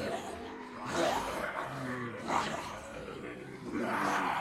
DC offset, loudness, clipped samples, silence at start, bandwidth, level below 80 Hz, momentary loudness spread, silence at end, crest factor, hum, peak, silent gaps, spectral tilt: under 0.1%; -36 LUFS; under 0.1%; 0 s; 16.5 kHz; -62 dBFS; 12 LU; 0 s; 18 dB; none; -18 dBFS; none; -4 dB/octave